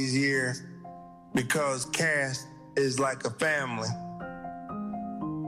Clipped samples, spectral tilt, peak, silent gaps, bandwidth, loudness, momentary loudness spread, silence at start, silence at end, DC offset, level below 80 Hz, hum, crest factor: under 0.1%; -4 dB/octave; -14 dBFS; none; 15.5 kHz; -30 LUFS; 14 LU; 0 s; 0 s; under 0.1%; -64 dBFS; none; 16 dB